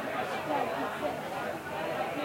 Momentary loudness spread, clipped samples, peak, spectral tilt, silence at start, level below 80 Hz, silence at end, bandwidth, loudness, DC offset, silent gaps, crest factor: 4 LU; under 0.1%; -20 dBFS; -4.5 dB/octave; 0 s; -70 dBFS; 0 s; 16.5 kHz; -34 LUFS; under 0.1%; none; 14 dB